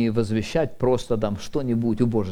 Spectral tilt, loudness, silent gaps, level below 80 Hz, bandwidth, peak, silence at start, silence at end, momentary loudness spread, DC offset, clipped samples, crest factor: -7 dB/octave; -24 LUFS; none; -40 dBFS; 13 kHz; -8 dBFS; 0 s; 0 s; 4 LU; under 0.1%; under 0.1%; 14 dB